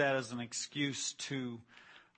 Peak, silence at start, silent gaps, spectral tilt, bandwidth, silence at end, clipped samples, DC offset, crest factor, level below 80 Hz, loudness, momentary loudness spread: -18 dBFS; 0 s; none; -3 dB/octave; 8.8 kHz; 0.15 s; under 0.1%; under 0.1%; 20 dB; -80 dBFS; -38 LUFS; 18 LU